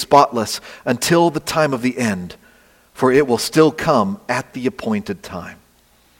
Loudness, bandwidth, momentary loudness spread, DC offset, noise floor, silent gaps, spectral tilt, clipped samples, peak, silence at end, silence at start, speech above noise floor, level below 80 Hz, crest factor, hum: -18 LUFS; 17 kHz; 14 LU; under 0.1%; -55 dBFS; none; -5 dB/octave; under 0.1%; 0 dBFS; 0.65 s; 0 s; 37 dB; -52 dBFS; 18 dB; none